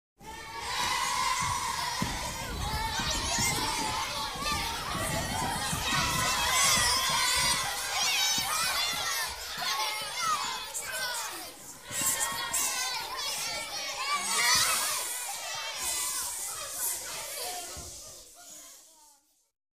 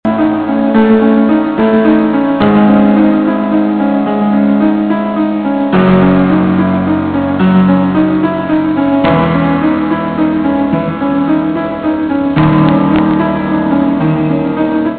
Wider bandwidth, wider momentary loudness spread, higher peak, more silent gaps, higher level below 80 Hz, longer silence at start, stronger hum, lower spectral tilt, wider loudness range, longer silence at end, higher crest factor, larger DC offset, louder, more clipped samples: first, 16 kHz vs 4.5 kHz; first, 13 LU vs 5 LU; second, -12 dBFS vs 0 dBFS; neither; second, -50 dBFS vs -38 dBFS; first, 0.2 s vs 0.05 s; neither; second, -0.5 dB/octave vs -10.5 dB/octave; first, 7 LU vs 3 LU; first, 0.65 s vs 0 s; first, 20 dB vs 10 dB; neither; second, -29 LUFS vs -11 LUFS; neither